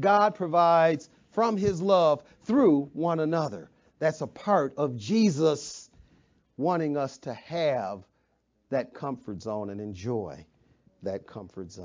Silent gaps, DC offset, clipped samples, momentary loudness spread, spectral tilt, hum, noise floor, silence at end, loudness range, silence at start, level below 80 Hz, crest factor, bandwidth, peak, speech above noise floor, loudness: none; under 0.1%; under 0.1%; 16 LU; -6.5 dB/octave; none; -72 dBFS; 0 s; 11 LU; 0 s; -62 dBFS; 18 dB; 7.6 kHz; -10 dBFS; 45 dB; -27 LUFS